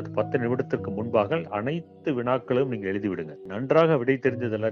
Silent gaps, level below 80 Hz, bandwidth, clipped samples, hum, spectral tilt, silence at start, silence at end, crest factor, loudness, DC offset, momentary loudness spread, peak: none; -66 dBFS; 6.6 kHz; under 0.1%; none; -9 dB/octave; 0 s; 0 s; 18 dB; -26 LUFS; under 0.1%; 10 LU; -8 dBFS